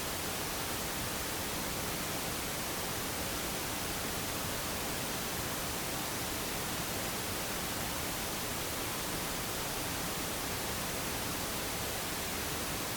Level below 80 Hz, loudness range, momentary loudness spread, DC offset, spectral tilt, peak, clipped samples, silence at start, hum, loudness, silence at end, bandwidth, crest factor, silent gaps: -52 dBFS; 0 LU; 0 LU; under 0.1%; -2.5 dB/octave; -24 dBFS; under 0.1%; 0 s; none; -35 LUFS; 0 s; over 20 kHz; 14 dB; none